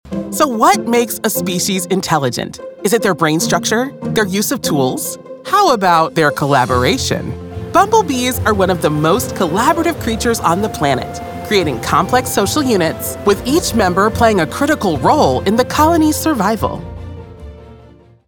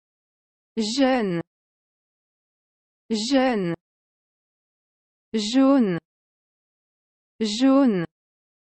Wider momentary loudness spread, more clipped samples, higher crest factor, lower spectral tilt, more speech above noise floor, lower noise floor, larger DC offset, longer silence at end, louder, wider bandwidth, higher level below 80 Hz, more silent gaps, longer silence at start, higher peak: second, 9 LU vs 13 LU; neither; about the same, 14 dB vs 18 dB; about the same, -4.5 dB/octave vs -5 dB/octave; second, 29 dB vs over 70 dB; second, -43 dBFS vs under -90 dBFS; neither; second, 0.5 s vs 0.7 s; first, -14 LUFS vs -22 LUFS; first, over 20 kHz vs 8.6 kHz; first, -38 dBFS vs -64 dBFS; second, none vs 1.47-3.09 s, 3.81-5.32 s, 6.05-7.39 s; second, 0.05 s vs 0.75 s; first, 0 dBFS vs -8 dBFS